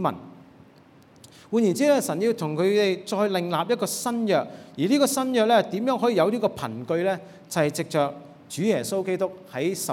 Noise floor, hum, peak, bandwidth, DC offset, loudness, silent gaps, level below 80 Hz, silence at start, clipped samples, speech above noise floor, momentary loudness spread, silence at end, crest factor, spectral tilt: -53 dBFS; none; -8 dBFS; 18 kHz; under 0.1%; -24 LUFS; none; -72 dBFS; 0 s; under 0.1%; 29 dB; 8 LU; 0 s; 18 dB; -5 dB/octave